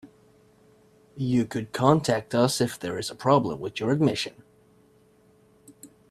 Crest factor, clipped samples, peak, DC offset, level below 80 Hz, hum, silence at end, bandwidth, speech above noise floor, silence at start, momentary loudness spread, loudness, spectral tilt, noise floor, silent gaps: 22 dB; under 0.1%; -4 dBFS; under 0.1%; -62 dBFS; none; 0.25 s; 15 kHz; 35 dB; 0.05 s; 9 LU; -25 LUFS; -5.5 dB/octave; -59 dBFS; none